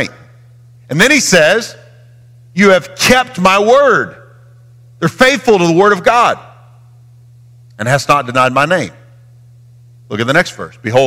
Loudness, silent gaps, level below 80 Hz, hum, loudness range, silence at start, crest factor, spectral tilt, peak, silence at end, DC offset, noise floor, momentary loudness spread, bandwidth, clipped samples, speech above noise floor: -11 LUFS; none; -46 dBFS; none; 5 LU; 0 s; 14 dB; -4 dB/octave; 0 dBFS; 0 s; under 0.1%; -41 dBFS; 14 LU; 16.5 kHz; under 0.1%; 30 dB